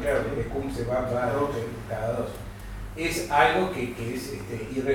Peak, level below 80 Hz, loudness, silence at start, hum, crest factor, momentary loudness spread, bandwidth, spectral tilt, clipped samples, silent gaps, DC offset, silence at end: -6 dBFS; -42 dBFS; -27 LUFS; 0 s; none; 20 dB; 13 LU; 18 kHz; -5.5 dB/octave; under 0.1%; none; under 0.1%; 0 s